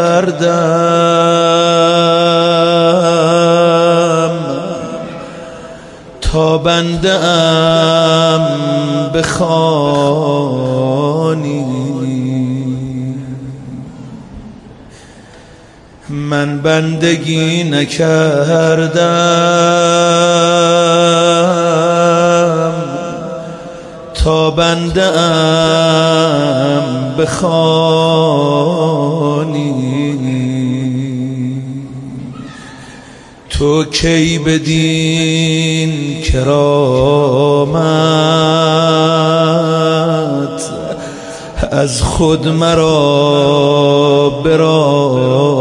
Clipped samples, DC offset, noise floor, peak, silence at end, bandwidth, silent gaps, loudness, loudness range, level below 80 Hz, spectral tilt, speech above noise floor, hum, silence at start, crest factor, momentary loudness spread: under 0.1%; under 0.1%; -38 dBFS; 0 dBFS; 0 s; 11.5 kHz; none; -11 LUFS; 8 LU; -32 dBFS; -5.5 dB/octave; 28 dB; none; 0 s; 12 dB; 14 LU